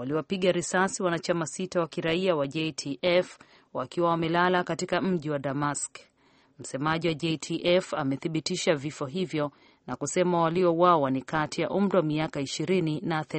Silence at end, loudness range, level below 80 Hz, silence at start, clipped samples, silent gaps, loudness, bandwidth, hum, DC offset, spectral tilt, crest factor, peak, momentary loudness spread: 0 s; 3 LU; -64 dBFS; 0 s; under 0.1%; none; -27 LUFS; 8.8 kHz; none; under 0.1%; -5 dB/octave; 20 dB; -6 dBFS; 8 LU